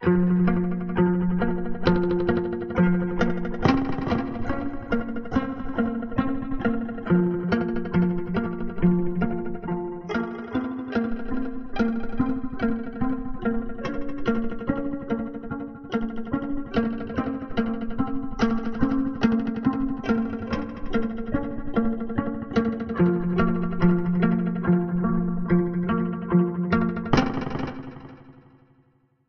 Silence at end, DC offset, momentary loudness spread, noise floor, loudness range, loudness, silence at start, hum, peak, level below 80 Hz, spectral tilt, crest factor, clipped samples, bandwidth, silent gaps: 0.95 s; under 0.1%; 8 LU; -63 dBFS; 5 LU; -26 LUFS; 0 s; none; -4 dBFS; -40 dBFS; -9 dB/octave; 20 dB; under 0.1%; 6.4 kHz; none